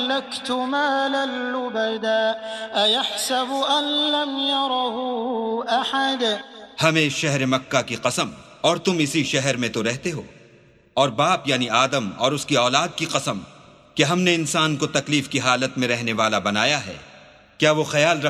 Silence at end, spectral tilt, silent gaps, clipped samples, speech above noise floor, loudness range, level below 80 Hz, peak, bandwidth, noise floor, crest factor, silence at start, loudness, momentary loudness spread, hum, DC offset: 0 s; -3.5 dB/octave; none; under 0.1%; 31 dB; 1 LU; -62 dBFS; -2 dBFS; 14 kHz; -53 dBFS; 20 dB; 0 s; -21 LUFS; 7 LU; none; under 0.1%